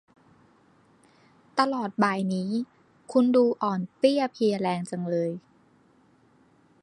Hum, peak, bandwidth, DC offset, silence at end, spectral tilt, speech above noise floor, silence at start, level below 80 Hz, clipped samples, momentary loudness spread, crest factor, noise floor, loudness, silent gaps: none; -4 dBFS; 11.5 kHz; under 0.1%; 1.45 s; -6.5 dB/octave; 36 dB; 1.55 s; -76 dBFS; under 0.1%; 9 LU; 24 dB; -61 dBFS; -26 LUFS; none